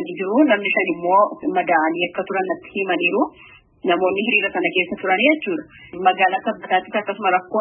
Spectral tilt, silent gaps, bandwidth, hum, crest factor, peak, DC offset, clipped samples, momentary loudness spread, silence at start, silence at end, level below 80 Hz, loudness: -9.5 dB/octave; none; 3.6 kHz; none; 16 dB; -2 dBFS; under 0.1%; under 0.1%; 8 LU; 0 s; 0 s; -64 dBFS; -19 LUFS